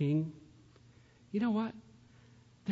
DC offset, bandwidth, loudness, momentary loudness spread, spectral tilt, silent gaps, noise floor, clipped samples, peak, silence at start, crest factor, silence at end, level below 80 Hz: under 0.1%; 7.6 kHz; -36 LUFS; 20 LU; -8 dB/octave; none; -61 dBFS; under 0.1%; -22 dBFS; 0 s; 16 dB; 0 s; -72 dBFS